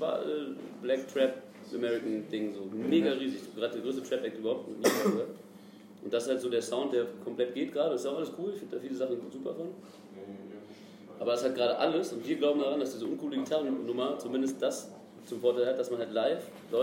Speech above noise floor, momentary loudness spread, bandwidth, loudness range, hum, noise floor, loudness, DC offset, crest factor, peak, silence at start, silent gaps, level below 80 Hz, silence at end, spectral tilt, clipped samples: 20 dB; 17 LU; 16 kHz; 4 LU; none; -52 dBFS; -32 LUFS; under 0.1%; 22 dB; -10 dBFS; 0 s; none; -86 dBFS; 0 s; -4.5 dB/octave; under 0.1%